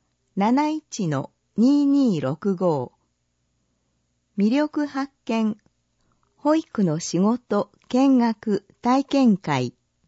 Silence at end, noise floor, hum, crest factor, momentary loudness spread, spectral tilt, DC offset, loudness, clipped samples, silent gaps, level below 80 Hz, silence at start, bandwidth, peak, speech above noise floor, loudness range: 0.35 s; -72 dBFS; 60 Hz at -55 dBFS; 16 dB; 10 LU; -6.5 dB/octave; under 0.1%; -22 LUFS; under 0.1%; none; -68 dBFS; 0.35 s; 8 kHz; -8 dBFS; 51 dB; 5 LU